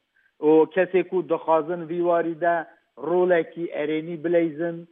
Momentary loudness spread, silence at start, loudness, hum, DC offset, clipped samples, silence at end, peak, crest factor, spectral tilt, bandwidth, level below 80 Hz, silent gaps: 10 LU; 0.4 s; -23 LUFS; none; under 0.1%; under 0.1%; 0.05 s; -8 dBFS; 16 dB; -10.5 dB/octave; 3.8 kHz; -86 dBFS; none